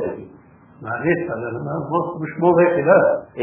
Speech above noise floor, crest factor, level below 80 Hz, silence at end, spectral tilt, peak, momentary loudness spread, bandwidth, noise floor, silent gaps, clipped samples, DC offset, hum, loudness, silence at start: 29 dB; 18 dB; -56 dBFS; 0 s; -11.5 dB/octave; 0 dBFS; 14 LU; 3.4 kHz; -47 dBFS; none; under 0.1%; under 0.1%; none; -19 LUFS; 0 s